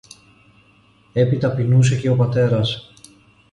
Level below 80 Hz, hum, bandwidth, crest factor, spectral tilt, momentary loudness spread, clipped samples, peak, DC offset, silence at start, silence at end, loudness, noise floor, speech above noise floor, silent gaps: -50 dBFS; none; 11 kHz; 14 dB; -7 dB/octave; 9 LU; under 0.1%; -4 dBFS; under 0.1%; 1.15 s; 0.7 s; -18 LUFS; -54 dBFS; 38 dB; none